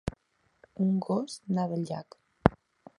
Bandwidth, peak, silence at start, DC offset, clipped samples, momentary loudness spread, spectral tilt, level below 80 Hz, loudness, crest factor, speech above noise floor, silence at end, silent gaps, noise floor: 11.5 kHz; 0 dBFS; 0.05 s; under 0.1%; under 0.1%; 12 LU; -7.5 dB/octave; -50 dBFS; -31 LUFS; 32 dB; 36 dB; 0.45 s; none; -67 dBFS